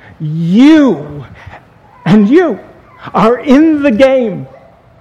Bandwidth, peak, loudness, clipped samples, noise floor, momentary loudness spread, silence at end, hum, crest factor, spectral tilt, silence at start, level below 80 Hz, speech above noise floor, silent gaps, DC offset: 8.8 kHz; 0 dBFS; -9 LUFS; 0.8%; -39 dBFS; 16 LU; 0.55 s; none; 10 dB; -7.5 dB/octave; 0.2 s; -44 dBFS; 30 dB; none; under 0.1%